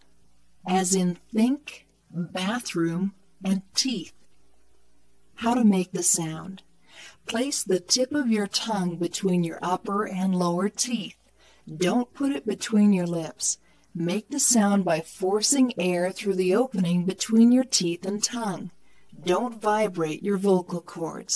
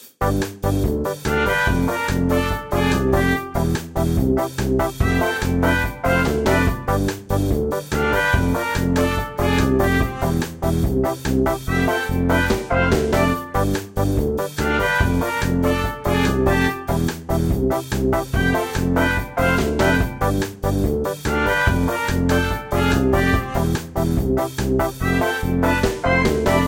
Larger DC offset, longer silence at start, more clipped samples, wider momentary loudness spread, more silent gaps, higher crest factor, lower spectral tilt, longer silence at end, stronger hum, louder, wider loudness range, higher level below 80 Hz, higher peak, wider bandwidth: neither; first, 0.65 s vs 0 s; neither; first, 13 LU vs 5 LU; neither; about the same, 20 dB vs 16 dB; second, -4 dB/octave vs -6 dB/octave; about the same, 0 s vs 0 s; neither; second, -25 LUFS vs -20 LUFS; first, 5 LU vs 1 LU; second, -68 dBFS vs -28 dBFS; about the same, -6 dBFS vs -4 dBFS; second, 11 kHz vs 17 kHz